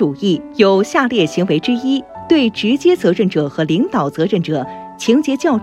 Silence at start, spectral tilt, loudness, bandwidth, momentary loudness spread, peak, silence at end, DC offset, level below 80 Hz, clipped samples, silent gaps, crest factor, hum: 0 s; -6 dB/octave; -15 LUFS; 13 kHz; 6 LU; 0 dBFS; 0 s; under 0.1%; -54 dBFS; under 0.1%; none; 14 dB; none